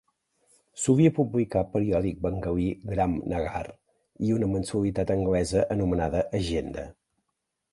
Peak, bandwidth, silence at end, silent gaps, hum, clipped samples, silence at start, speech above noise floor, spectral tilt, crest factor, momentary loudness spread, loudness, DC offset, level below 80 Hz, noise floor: -8 dBFS; 11.5 kHz; 0.8 s; none; none; under 0.1%; 0.75 s; 55 dB; -7 dB/octave; 20 dB; 10 LU; -27 LUFS; under 0.1%; -44 dBFS; -81 dBFS